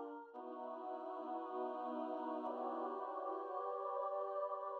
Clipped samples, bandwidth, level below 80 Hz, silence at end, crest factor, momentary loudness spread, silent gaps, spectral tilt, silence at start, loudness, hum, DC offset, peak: under 0.1%; 5.8 kHz; under -90 dBFS; 0 s; 12 dB; 6 LU; none; -2.5 dB/octave; 0 s; -44 LUFS; none; under 0.1%; -32 dBFS